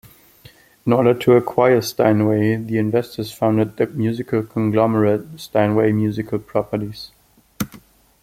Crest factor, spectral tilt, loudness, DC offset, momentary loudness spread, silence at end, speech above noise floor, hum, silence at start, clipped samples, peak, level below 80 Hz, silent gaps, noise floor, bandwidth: 18 dB; -7 dB/octave; -19 LUFS; under 0.1%; 13 LU; 0.45 s; 30 dB; none; 0.85 s; under 0.1%; -2 dBFS; -54 dBFS; none; -48 dBFS; 16.5 kHz